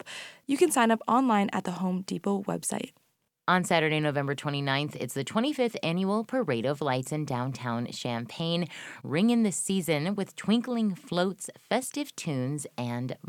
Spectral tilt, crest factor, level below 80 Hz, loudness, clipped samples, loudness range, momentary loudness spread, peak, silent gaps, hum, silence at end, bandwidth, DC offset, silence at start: -5 dB/octave; 20 dB; -74 dBFS; -29 LUFS; under 0.1%; 3 LU; 9 LU; -8 dBFS; none; none; 0 s; 17 kHz; under 0.1%; 0.05 s